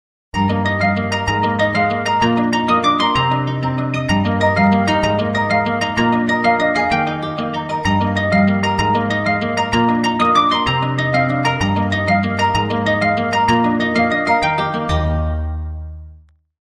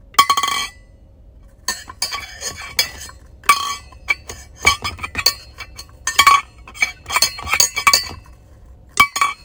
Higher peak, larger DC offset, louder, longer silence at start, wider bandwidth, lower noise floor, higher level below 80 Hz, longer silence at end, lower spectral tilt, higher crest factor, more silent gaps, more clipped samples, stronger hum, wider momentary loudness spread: second, -4 dBFS vs 0 dBFS; neither; about the same, -16 LUFS vs -17 LUFS; first, 0.35 s vs 0.2 s; second, 11.5 kHz vs 19 kHz; about the same, -45 dBFS vs -45 dBFS; first, -34 dBFS vs -42 dBFS; first, 0.45 s vs 0.1 s; first, -6 dB/octave vs 0.5 dB/octave; second, 14 dB vs 20 dB; neither; neither; neither; second, 6 LU vs 18 LU